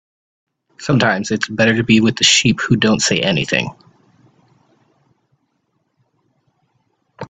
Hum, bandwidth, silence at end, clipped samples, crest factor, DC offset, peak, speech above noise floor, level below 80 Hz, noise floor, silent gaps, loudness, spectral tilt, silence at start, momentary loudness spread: none; 9.4 kHz; 0.05 s; under 0.1%; 18 dB; under 0.1%; 0 dBFS; 53 dB; -52 dBFS; -67 dBFS; none; -14 LUFS; -3.5 dB/octave; 0.8 s; 8 LU